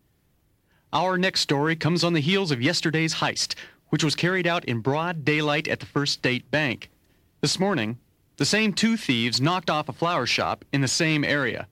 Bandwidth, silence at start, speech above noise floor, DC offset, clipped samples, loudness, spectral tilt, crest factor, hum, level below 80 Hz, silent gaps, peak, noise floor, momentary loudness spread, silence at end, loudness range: 16 kHz; 0.9 s; 42 dB; under 0.1%; under 0.1%; -24 LUFS; -4 dB/octave; 14 dB; none; -62 dBFS; none; -10 dBFS; -66 dBFS; 6 LU; 0.05 s; 2 LU